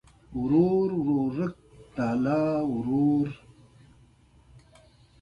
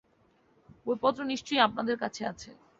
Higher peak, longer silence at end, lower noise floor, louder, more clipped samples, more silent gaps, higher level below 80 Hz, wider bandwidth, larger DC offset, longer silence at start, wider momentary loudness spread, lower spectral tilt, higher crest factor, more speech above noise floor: about the same, -12 dBFS vs -10 dBFS; first, 1.85 s vs 0.25 s; second, -58 dBFS vs -67 dBFS; first, -26 LUFS vs -30 LUFS; neither; neither; first, -56 dBFS vs -68 dBFS; about the same, 7.4 kHz vs 7.8 kHz; neither; second, 0.3 s vs 0.85 s; about the same, 11 LU vs 13 LU; first, -9.5 dB/octave vs -3.5 dB/octave; second, 16 dB vs 22 dB; about the same, 34 dB vs 37 dB